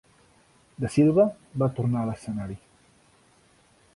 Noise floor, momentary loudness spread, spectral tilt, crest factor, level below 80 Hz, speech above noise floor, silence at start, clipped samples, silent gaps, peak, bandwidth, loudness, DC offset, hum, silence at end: -60 dBFS; 14 LU; -8.5 dB/octave; 18 dB; -56 dBFS; 36 dB; 0.8 s; under 0.1%; none; -8 dBFS; 11.5 kHz; -25 LUFS; under 0.1%; none; 1.4 s